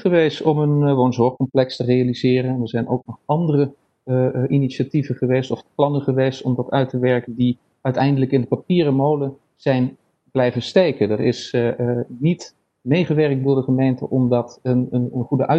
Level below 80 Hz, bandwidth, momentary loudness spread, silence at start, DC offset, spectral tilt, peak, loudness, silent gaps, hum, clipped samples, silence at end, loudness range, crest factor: -56 dBFS; 8 kHz; 6 LU; 0 s; under 0.1%; -8 dB/octave; 0 dBFS; -20 LUFS; none; none; under 0.1%; 0 s; 2 LU; 18 dB